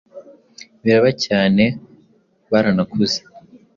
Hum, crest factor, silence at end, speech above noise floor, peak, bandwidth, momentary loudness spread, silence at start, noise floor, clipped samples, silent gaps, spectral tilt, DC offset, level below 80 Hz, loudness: none; 16 dB; 0.35 s; 41 dB; -2 dBFS; 7.4 kHz; 8 LU; 0.15 s; -57 dBFS; under 0.1%; none; -5.5 dB/octave; under 0.1%; -54 dBFS; -17 LUFS